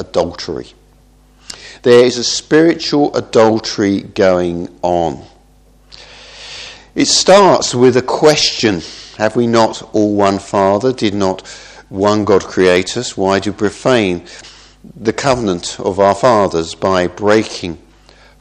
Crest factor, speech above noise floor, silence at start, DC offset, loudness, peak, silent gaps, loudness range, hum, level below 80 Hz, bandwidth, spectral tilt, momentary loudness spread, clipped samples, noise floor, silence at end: 14 dB; 34 dB; 0 s; under 0.1%; -13 LUFS; 0 dBFS; none; 4 LU; none; -46 dBFS; 12 kHz; -4 dB/octave; 17 LU; 0.2%; -47 dBFS; 0.65 s